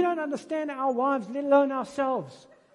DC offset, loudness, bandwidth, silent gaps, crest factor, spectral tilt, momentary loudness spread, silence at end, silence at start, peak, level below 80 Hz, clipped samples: under 0.1%; -27 LUFS; 11 kHz; none; 18 dB; -6 dB/octave; 9 LU; 0.4 s; 0 s; -10 dBFS; -76 dBFS; under 0.1%